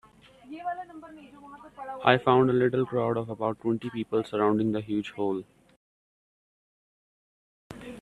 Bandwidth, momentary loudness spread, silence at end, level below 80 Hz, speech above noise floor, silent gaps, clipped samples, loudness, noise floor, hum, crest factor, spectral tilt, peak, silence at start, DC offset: 10.5 kHz; 25 LU; 0 s; -64 dBFS; 24 dB; 5.76-7.70 s; under 0.1%; -27 LUFS; -51 dBFS; none; 28 dB; -7.5 dB/octave; -2 dBFS; 0.45 s; under 0.1%